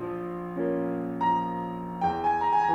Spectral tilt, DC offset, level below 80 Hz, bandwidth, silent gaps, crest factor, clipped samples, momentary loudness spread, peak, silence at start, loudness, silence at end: -8 dB/octave; under 0.1%; -56 dBFS; 8.6 kHz; none; 14 dB; under 0.1%; 9 LU; -14 dBFS; 0 s; -28 LUFS; 0 s